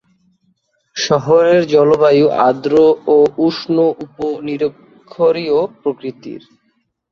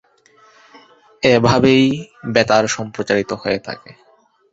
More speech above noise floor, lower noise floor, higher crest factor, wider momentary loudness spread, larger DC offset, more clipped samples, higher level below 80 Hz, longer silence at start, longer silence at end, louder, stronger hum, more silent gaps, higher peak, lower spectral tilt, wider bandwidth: first, 51 dB vs 36 dB; first, -64 dBFS vs -52 dBFS; about the same, 14 dB vs 16 dB; about the same, 14 LU vs 12 LU; neither; neither; second, -56 dBFS vs -50 dBFS; second, 0.95 s vs 1.2 s; first, 0.75 s vs 0.6 s; about the same, -14 LUFS vs -16 LUFS; neither; neither; about the same, 0 dBFS vs -2 dBFS; about the same, -6 dB/octave vs -5 dB/octave; second, 7.2 kHz vs 8 kHz